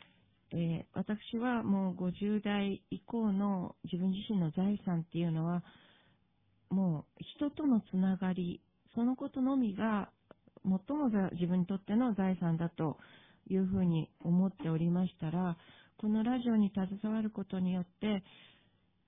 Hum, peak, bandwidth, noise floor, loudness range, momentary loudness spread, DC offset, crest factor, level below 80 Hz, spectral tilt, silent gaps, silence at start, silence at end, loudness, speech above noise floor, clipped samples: none; -20 dBFS; 3.8 kHz; -74 dBFS; 2 LU; 7 LU; under 0.1%; 14 dB; -66 dBFS; -11 dB/octave; none; 0.5 s; 0.85 s; -35 LUFS; 40 dB; under 0.1%